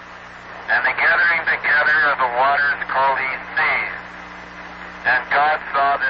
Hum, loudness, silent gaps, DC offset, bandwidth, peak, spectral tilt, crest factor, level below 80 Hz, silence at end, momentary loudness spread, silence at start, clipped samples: 60 Hz at -45 dBFS; -17 LUFS; none; under 0.1%; 7.2 kHz; -8 dBFS; -4 dB/octave; 12 dB; -52 dBFS; 0 s; 20 LU; 0 s; under 0.1%